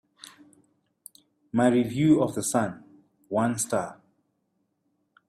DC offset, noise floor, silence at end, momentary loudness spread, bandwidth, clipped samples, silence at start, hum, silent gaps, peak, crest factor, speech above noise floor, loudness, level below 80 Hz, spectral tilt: under 0.1%; -75 dBFS; 1.35 s; 20 LU; 15.5 kHz; under 0.1%; 0.25 s; none; none; -8 dBFS; 20 dB; 51 dB; -25 LUFS; -66 dBFS; -5.5 dB/octave